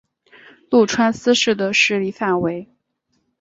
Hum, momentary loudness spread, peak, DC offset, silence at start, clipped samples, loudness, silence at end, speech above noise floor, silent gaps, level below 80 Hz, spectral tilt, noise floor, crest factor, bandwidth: none; 6 LU; -2 dBFS; under 0.1%; 0.7 s; under 0.1%; -17 LUFS; 0.75 s; 52 dB; none; -58 dBFS; -3.5 dB/octave; -69 dBFS; 16 dB; 8 kHz